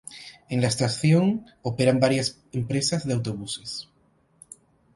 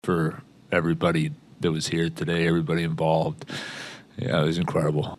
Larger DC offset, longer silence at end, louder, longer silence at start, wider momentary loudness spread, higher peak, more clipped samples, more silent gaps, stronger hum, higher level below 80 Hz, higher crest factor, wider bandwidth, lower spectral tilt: neither; first, 1.1 s vs 0.05 s; about the same, -24 LUFS vs -25 LUFS; about the same, 0.1 s vs 0.05 s; about the same, 13 LU vs 11 LU; about the same, -4 dBFS vs -6 dBFS; neither; neither; neither; about the same, -58 dBFS vs -54 dBFS; about the same, 20 dB vs 18 dB; about the same, 11.5 kHz vs 12.5 kHz; about the same, -5.5 dB/octave vs -6 dB/octave